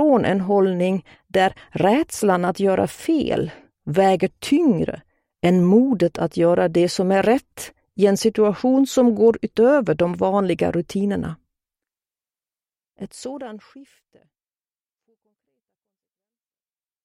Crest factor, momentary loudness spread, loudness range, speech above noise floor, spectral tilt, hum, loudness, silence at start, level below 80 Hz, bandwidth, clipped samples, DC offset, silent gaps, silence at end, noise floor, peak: 16 dB; 16 LU; 21 LU; over 71 dB; -6.5 dB/octave; none; -19 LUFS; 0 s; -54 dBFS; 16 kHz; under 0.1%; under 0.1%; none; 3.2 s; under -90 dBFS; -4 dBFS